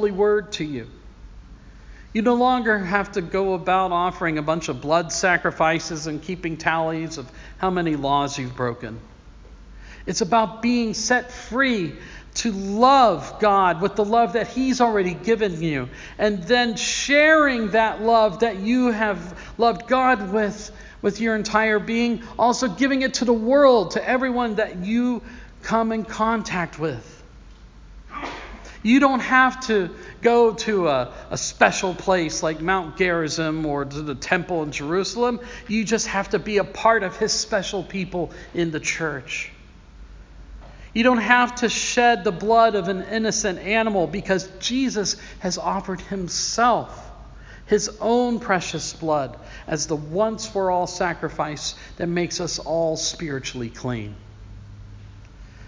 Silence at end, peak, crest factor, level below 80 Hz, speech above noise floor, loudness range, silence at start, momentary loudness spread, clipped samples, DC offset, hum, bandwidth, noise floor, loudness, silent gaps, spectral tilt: 0 s; 0 dBFS; 22 dB; -46 dBFS; 23 dB; 6 LU; 0 s; 12 LU; under 0.1%; under 0.1%; none; 7.6 kHz; -45 dBFS; -21 LUFS; none; -4 dB/octave